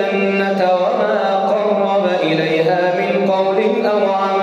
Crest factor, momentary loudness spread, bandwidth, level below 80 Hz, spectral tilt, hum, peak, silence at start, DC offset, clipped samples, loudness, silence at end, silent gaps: 12 dB; 1 LU; 8.4 kHz; -70 dBFS; -6.5 dB/octave; none; -4 dBFS; 0 s; under 0.1%; under 0.1%; -16 LUFS; 0 s; none